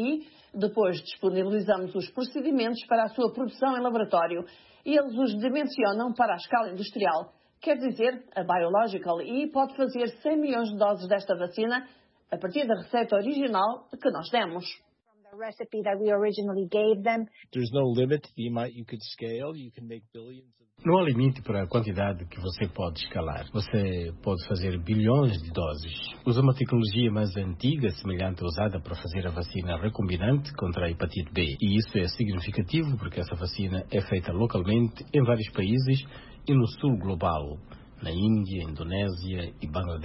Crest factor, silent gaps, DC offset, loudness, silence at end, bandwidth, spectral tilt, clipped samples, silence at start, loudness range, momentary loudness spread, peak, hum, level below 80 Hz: 18 dB; none; under 0.1%; -28 LUFS; 0 s; 5.8 kHz; -10.5 dB/octave; under 0.1%; 0 s; 3 LU; 10 LU; -10 dBFS; none; -48 dBFS